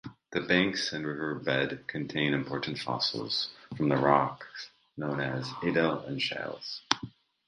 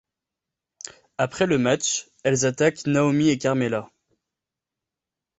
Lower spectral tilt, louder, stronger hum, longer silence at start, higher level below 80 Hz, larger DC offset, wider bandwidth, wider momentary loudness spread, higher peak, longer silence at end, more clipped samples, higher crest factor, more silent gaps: about the same, -5 dB/octave vs -4.5 dB/octave; second, -30 LUFS vs -22 LUFS; neither; second, 0.05 s vs 1.2 s; about the same, -64 dBFS vs -60 dBFS; neither; first, 11 kHz vs 8.2 kHz; second, 11 LU vs 15 LU; first, 0 dBFS vs -6 dBFS; second, 0.4 s vs 1.55 s; neither; first, 30 dB vs 20 dB; neither